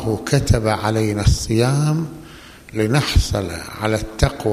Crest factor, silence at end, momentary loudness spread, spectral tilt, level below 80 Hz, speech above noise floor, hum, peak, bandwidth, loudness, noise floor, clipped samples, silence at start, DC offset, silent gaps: 16 dB; 0 s; 13 LU; -5.5 dB/octave; -28 dBFS; 22 dB; none; -2 dBFS; 15 kHz; -19 LUFS; -40 dBFS; under 0.1%; 0 s; under 0.1%; none